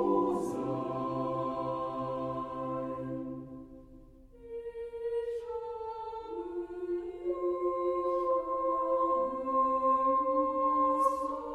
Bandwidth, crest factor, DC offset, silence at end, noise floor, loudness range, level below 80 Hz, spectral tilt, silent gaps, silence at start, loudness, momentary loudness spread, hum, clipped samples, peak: 12.5 kHz; 16 dB; under 0.1%; 0 s; -54 dBFS; 11 LU; -60 dBFS; -8 dB/octave; none; 0 s; -32 LUFS; 13 LU; none; under 0.1%; -16 dBFS